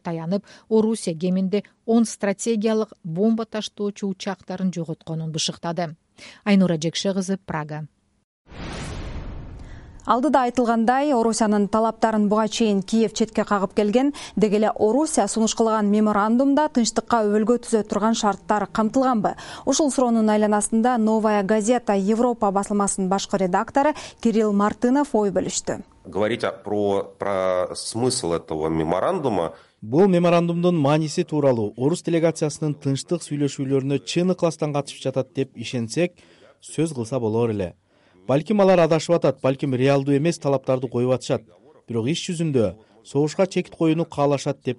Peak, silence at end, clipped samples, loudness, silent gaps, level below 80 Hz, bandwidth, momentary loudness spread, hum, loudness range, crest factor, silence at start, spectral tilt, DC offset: -4 dBFS; 0.05 s; under 0.1%; -22 LUFS; 8.24-8.45 s; -50 dBFS; 11.5 kHz; 9 LU; none; 5 LU; 18 dB; 0.05 s; -5.5 dB/octave; under 0.1%